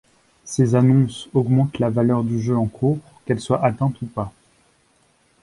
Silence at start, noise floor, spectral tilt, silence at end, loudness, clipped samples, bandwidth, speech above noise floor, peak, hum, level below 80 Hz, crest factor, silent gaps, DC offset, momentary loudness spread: 0.45 s; -60 dBFS; -7.5 dB/octave; 1.15 s; -20 LUFS; under 0.1%; 11.5 kHz; 41 dB; -4 dBFS; none; -52 dBFS; 16 dB; none; under 0.1%; 11 LU